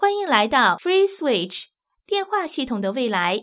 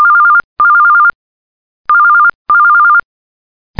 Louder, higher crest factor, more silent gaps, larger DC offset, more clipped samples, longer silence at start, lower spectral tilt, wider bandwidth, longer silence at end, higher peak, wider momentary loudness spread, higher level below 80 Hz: second, -21 LUFS vs -7 LUFS; first, 20 dB vs 8 dB; second, none vs 0.44-0.56 s, 1.15-1.85 s, 2.35-2.45 s; second, under 0.1% vs 0.7%; neither; about the same, 0 s vs 0 s; first, -8 dB/octave vs -4.5 dB/octave; second, 4 kHz vs 4.9 kHz; second, 0 s vs 0.8 s; about the same, -2 dBFS vs 0 dBFS; about the same, 8 LU vs 6 LU; about the same, -60 dBFS vs -56 dBFS